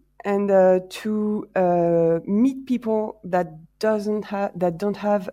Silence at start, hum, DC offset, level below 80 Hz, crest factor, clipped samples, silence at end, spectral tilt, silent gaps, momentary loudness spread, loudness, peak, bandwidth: 0.25 s; none; under 0.1%; -60 dBFS; 16 dB; under 0.1%; 0 s; -7.5 dB/octave; none; 8 LU; -22 LUFS; -6 dBFS; 15.5 kHz